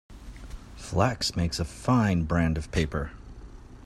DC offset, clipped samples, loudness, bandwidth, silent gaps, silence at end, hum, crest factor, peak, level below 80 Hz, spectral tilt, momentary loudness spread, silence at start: under 0.1%; under 0.1%; -27 LUFS; 13.5 kHz; none; 0 s; none; 20 dB; -8 dBFS; -40 dBFS; -5.5 dB/octave; 22 LU; 0.1 s